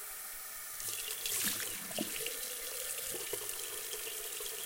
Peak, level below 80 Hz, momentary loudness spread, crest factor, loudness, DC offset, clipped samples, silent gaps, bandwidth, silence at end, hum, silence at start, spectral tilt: -18 dBFS; -68 dBFS; 8 LU; 22 dB; -37 LUFS; under 0.1%; under 0.1%; none; 17 kHz; 0 s; none; 0 s; 0 dB/octave